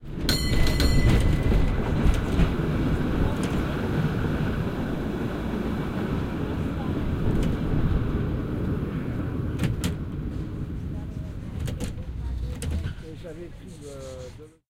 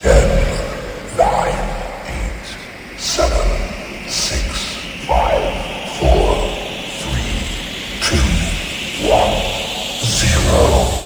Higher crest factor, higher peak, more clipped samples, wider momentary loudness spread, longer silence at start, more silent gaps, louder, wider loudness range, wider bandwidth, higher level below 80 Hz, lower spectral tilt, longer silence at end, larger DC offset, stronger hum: about the same, 18 dB vs 16 dB; second, -8 dBFS vs 0 dBFS; neither; about the same, 12 LU vs 12 LU; about the same, 0 s vs 0 s; neither; second, -27 LUFS vs -18 LUFS; first, 9 LU vs 4 LU; second, 16.5 kHz vs over 20 kHz; second, -30 dBFS vs -22 dBFS; first, -6.5 dB/octave vs -4 dB/octave; first, 0.2 s vs 0 s; neither; neither